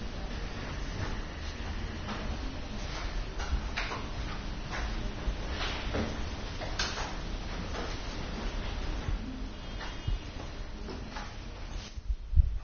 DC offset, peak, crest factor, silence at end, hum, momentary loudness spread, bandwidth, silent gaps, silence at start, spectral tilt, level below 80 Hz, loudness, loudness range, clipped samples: under 0.1%; -10 dBFS; 24 dB; 0 s; none; 8 LU; 6.8 kHz; none; 0 s; -4 dB/octave; -36 dBFS; -37 LUFS; 3 LU; under 0.1%